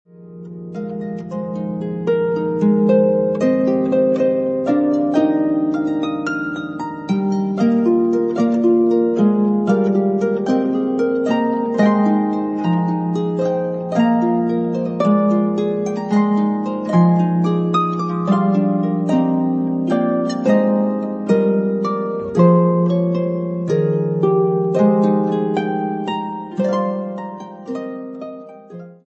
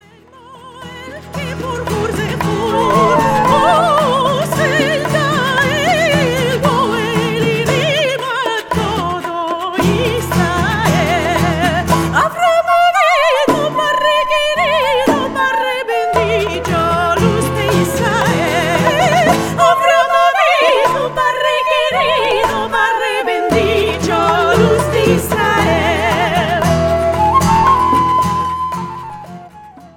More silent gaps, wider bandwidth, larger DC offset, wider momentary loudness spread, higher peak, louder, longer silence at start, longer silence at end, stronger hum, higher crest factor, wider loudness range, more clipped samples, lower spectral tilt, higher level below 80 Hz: neither; second, 8 kHz vs 18 kHz; neither; first, 11 LU vs 7 LU; about the same, -2 dBFS vs 0 dBFS; second, -18 LUFS vs -13 LUFS; second, 0.2 s vs 0.45 s; about the same, 0.15 s vs 0.1 s; neither; about the same, 16 dB vs 14 dB; about the same, 3 LU vs 3 LU; neither; first, -9 dB/octave vs -5 dB/octave; second, -60 dBFS vs -36 dBFS